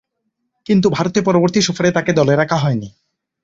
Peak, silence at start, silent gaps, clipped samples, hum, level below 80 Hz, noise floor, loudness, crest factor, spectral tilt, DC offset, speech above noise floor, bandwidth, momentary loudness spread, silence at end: -2 dBFS; 0.7 s; none; under 0.1%; none; -52 dBFS; -72 dBFS; -16 LUFS; 16 dB; -5.5 dB/octave; under 0.1%; 58 dB; 7.8 kHz; 8 LU; 0.55 s